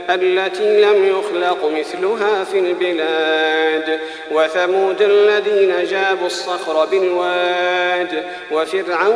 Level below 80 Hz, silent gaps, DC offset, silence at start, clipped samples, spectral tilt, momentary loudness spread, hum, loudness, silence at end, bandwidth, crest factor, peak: -66 dBFS; none; under 0.1%; 0 s; under 0.1%; -3 dB/octave; 7 LU; none; -16 LUFS; 0 s; 10.5 kHz; 14 dB; -2 dBFS